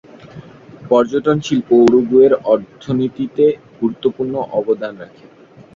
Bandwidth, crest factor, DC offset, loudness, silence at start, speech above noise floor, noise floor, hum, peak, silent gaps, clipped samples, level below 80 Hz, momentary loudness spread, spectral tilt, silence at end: 7.4 kHz; 16 dB; under 0.1%; -15 LUFS; 0.35 s; 23 dB; -37 dBFS; none; 0 dBFS; none; under 0.1%; -56 dBFS; 11 LU; -7 dB/octave; 0.7 s